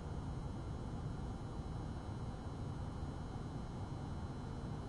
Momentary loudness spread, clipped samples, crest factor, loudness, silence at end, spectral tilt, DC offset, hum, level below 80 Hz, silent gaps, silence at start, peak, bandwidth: 1 LU; under 0.1%; 12 dB; -46 LUFS; 0 s; -7.5 dB/octave; under 0.1%; none; -50 dBFS; none; 0 s; -32 dBFS; 11.5 kHz